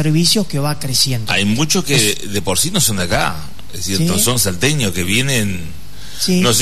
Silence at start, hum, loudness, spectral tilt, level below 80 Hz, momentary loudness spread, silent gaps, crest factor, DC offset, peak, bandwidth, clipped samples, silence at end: 0 s; none; -15 LUFS; -3.5 dB/octave; -38 dBFS; 11 LU; none; 14 dB; 7%; 0 dBFS; 14 kHz; under 0.1%; 0 s